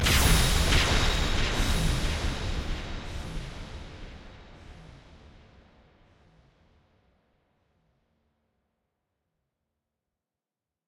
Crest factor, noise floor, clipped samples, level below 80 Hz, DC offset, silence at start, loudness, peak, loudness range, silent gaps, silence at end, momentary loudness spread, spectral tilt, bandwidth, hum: 20 dB; under -90 dBFS; under 0.1%; -34 dBFS; under 0.1%; 0 s; -27 LUFS; -10 dBFS; 24 LU; none; 5.7 s; 26 LU; -3.5 dB/octave; 16.5 kHz; none